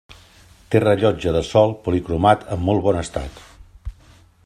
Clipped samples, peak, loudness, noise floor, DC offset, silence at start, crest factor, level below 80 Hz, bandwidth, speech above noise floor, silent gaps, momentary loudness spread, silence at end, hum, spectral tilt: under 0.1%; 0 dBFS; -19 LUFS; -50 dBFS; under 0.1%; 0.7 s; 20 dB; -40 dBFS; 12.5 kHz; 32 dB; none; 21 LU; 0.55 s; none; -7 dB/octave